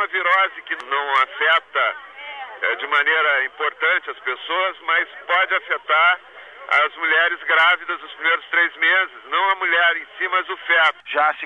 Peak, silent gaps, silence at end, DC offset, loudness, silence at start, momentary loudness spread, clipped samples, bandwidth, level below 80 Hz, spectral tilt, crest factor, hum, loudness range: -6 dBFS; none; 0 s; under 0.1%; -18 LUFS; 0 s; 8 LU; under 0.1%; 9.8 kHz; -74 dBFS; -0.5 dB/octave; 14 dB; 60 Hz at -75 dBFS; 2 LU